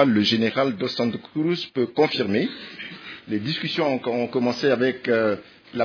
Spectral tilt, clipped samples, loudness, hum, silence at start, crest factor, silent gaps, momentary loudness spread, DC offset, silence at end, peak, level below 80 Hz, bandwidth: -6 dB/octave; under 0.1%; -23 LUFS; none; 0 s; 18 dB; none; 13 LU; under 0.1%; 0 s; -4 dBFS; -68 dBFS; 5.4 kHz